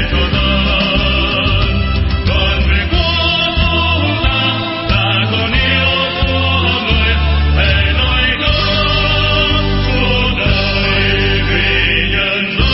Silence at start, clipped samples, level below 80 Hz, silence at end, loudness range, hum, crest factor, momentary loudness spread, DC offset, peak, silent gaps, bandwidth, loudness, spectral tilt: 0 s; under 0.1%; -18 dBFS; 0 s; 1 LU; none; 12 dB; 2 LU; under 0.1%; 0 dBFS; none; 5.8 kHz; -12 LUFS; -9 dB/octave